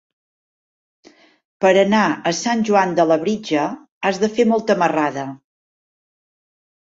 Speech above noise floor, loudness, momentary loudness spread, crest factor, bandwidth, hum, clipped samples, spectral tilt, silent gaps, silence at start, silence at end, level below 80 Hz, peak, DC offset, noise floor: over 73 dB; -18 LUFS; 8 LU; 18 dB; 7.8 kHz; none; under 0.1%; -5 dB/octave; 3.91-4.01 s; 1.6 s; 1.55 s; -64 dBFS; -2 dBFS; under 0.1%; under -90 dBFS